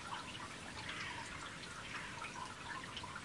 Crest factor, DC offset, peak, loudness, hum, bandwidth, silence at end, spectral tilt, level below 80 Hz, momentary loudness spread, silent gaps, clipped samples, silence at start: 16 dB; under 0.1%; -32 dBFS; -46 LUFS; none; 11.5 kHz; 0 s; -2.5 dB/octave; -66 dBFS; 3 LU; none; under 0.1%; 0 s